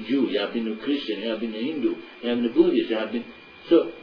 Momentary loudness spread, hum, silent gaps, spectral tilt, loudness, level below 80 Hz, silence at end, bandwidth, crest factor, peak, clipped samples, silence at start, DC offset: 10 LU; none; none; -7.5 dB/octave; -25 LUFS; -62 dBFS; 0 s; 5.2 kHz; 18 dB; -6 dBFS; under 0.1%; 0 s; under 0.1%